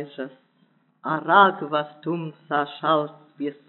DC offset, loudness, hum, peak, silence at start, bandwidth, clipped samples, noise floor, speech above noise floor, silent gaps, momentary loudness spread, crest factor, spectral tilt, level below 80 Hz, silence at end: under 0.1%; -22 LUFS; none; -4 dBFS; 0 s; 4.3 kHz; under 0.1%; -63 dBFS; 40 dB; none; 18 LU; 22 dB; -3 dB/octave; under -90 dBFS; 0.15 s